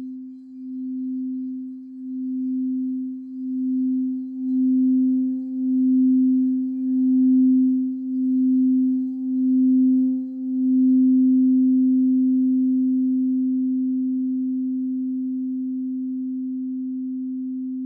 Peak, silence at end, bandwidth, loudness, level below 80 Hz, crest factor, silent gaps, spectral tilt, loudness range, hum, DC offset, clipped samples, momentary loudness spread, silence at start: -12 dBFS; 0 s; 0.8 kHz; -21 LUFS; -86 dBFS; 8 dB; none; -12 dB/octave; 8 LU; none; under 0.1%; under 0.1%; 12 LU; 0 s